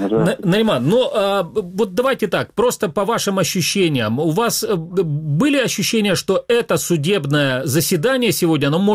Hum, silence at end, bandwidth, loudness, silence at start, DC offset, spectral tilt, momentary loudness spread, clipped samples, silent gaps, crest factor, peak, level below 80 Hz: none; 0 s; 16 kHz; -17 LUFS; 0 s; under 0.1%; -4.5 dB/octave; 4 LU; under 0.1%; none; 12 dB; -6 dBFS; -52 dBFS